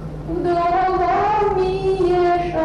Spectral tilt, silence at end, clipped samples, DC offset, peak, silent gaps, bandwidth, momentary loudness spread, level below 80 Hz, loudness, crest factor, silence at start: -7.5 dB/octave; 0 s; under 0.1%; under 0.1%; -10 dBFS; none; 10 kHz; 4 LU; -36 dBFS; -18 LUFS; 8 dB; 0 s